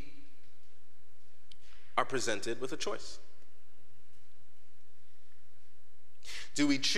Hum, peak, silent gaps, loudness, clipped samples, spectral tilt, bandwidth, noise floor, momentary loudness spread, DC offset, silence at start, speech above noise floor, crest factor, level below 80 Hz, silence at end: none; -12 dBFS; none; -35 LUFS; under 0.1%; -3 dB/octave; 15 kHz; -69 dBFS; 25 LU; 3%; 0 s; 34 dB; 28 dB; -68 dBFS; 0 s